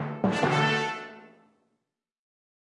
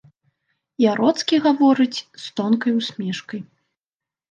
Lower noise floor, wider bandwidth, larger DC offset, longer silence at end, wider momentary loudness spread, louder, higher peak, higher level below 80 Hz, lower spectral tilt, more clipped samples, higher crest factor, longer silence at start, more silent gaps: second, -82 dBFS vs under -90 dBFS; first, 11 kHz vs 9.2 kHz; neither; first, 1.4 s vs 0.9 s; about the same, 15 LU vs 15 LU; second, -26 LUFS vs -20 LUFS; second, -12 dBFS vs -4 dBFS; about the same, -70 dBFS vs -74 dBFS; about the same, -5.5 dB/octave vs -5 dB/octave; neither; about the same, 18 dB vs 16 dB; second, 0 s vs 0.8 s; neither